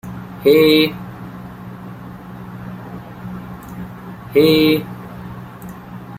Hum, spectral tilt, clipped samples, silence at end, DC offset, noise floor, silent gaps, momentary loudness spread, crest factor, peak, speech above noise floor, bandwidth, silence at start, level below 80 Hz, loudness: none; -6 dB/octave; under 0.1%; 0 s; under 0.1%; -34 dBFS; none; 22 LU; 18 dB; -2 dBFS; 22 dB; 16 kHz; 0.05 s; -48 dBFS; -14 LUFS